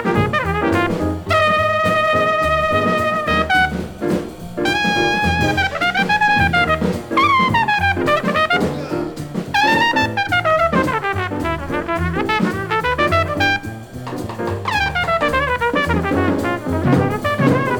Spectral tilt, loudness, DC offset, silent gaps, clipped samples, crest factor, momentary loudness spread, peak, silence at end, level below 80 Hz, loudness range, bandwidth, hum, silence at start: -5.5 dB/octave; -17 LUFS; under 0.1%; none; under 0.1%; 16 dB; 8 LU; -2 dBFS; 0 s; -36 dBFS; 3 LU; over 20 kHz; none; 0 s